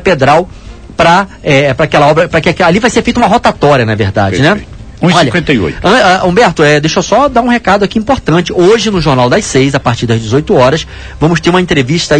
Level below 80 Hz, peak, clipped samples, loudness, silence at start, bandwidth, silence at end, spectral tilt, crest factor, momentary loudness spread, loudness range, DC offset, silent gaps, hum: -30 dBFS; 0 dBFS; 1%; -8 LUFS; 0 s; 11 kHz; 0 s; -5.5 dB/octave; 8 dB; 4 LU; 1 LU; 0.7%; none; none